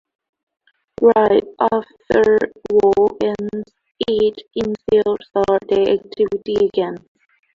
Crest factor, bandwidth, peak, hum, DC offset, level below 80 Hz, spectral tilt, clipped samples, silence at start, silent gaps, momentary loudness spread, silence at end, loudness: 16 dB; 7.2 kHz; -2 dBFS; none; under 0.1%; -50 dBFS; -6.5 dB/octave; under 0.1%; 1 s; none; 11 LU; 0.55 s; -17 LUFS